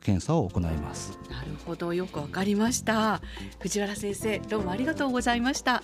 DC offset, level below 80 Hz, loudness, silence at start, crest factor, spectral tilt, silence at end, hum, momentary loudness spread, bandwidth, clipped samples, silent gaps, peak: under 0.1%; -46 dBFS; -29 LUFS; 0.05 s; 16 dB; -4.5 dB/octave; 0 s; none; 12 LU; 15.5 kHz; under 0.1%; none; -12 dBFS